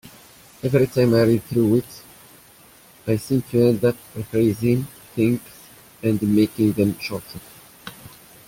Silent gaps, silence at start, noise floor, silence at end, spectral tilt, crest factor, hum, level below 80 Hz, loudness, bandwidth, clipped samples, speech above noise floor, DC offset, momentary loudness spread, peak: none; 0.65 s; -49 dBFS; 0.4 s; -7.5 dB/octave; 16 dB; none; -52 dBFS; -21 LUFS; 17 kHz; under 0.1%; 30 dB; under 0.1%; 21 LU; -4 dBFS